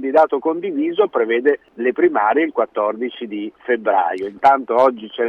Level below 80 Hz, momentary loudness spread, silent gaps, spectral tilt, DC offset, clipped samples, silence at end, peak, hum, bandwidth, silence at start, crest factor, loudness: -66 dBFS; 8 LU; none; -6.5 dB/octave; under 0.1%; under 0.1%; 0 s; -4 dBFS; none; 6.8 kHz; 0 s; 14 dB; -18 LUFS